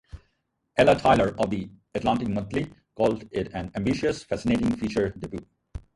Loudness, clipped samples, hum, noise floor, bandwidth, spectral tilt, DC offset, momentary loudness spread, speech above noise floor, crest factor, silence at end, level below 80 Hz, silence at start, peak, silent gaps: -25 LUFS; under 0.1%; none; -75 dBFS; 11.5 kHz; -6.5 dB/octave; under 0.1%; 16 LU; 50 dB; 20 dB; 0.2 s; -46 dBFS; 0.15 s; -4 dBFS; none